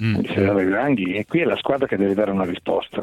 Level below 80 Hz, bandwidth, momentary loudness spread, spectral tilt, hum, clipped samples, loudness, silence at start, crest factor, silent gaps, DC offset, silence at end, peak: -54 dBFS; 12 kHz; 4 LU; -8 dB/octave; none; under 0.1%; -21 LUFS; 0 s; 16 dB; none; under 0.1%; 0 s; -4 dBFS